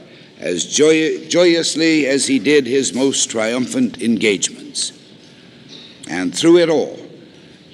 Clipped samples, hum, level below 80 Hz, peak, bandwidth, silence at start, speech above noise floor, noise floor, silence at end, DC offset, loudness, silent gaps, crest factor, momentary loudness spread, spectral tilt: under 0.1%; none; -66 dBFS; -2 dBFS; 12.5 kHz; 0.4 s; 27 dB; -43 dBFS; 0.6 s; under 0.1%; -16 LUFS; none; 16 dB; 11 LU; -3 dB/octave